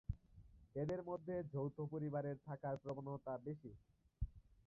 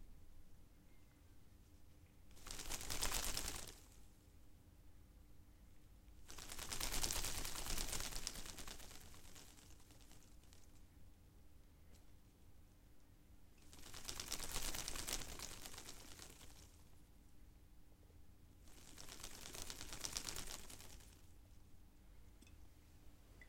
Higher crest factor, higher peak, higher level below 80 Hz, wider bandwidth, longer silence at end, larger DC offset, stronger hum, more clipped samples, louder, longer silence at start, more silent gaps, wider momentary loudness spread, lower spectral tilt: second, 18 dB vs 32 dB; second, -30 dBFS vs -20 dBFS; about the same, -58 dBFS vs -56 dBFS; second, 5.6 kHz vs 17 kHz; first, 0.15 s vs 0 s; neither; neither; neither; about the same, -47 LUFS vs -47 LUFS; about the same, 0.1 s vs 0 s; neither; second, 9 LU vs 25 LU; first, -9.5 dB/octave vs -1.5 dB/octave